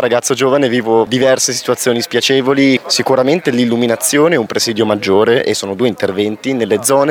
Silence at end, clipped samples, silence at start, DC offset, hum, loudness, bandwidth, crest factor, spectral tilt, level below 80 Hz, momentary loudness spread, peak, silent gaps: 0 s; under 0.1%; 0 s; under 0.1%; none; -13 LUFS; over 20 kHz; 12 dB; -3.5 dB/octave; -60 dBFS; 5 LU; 0 dBFS; none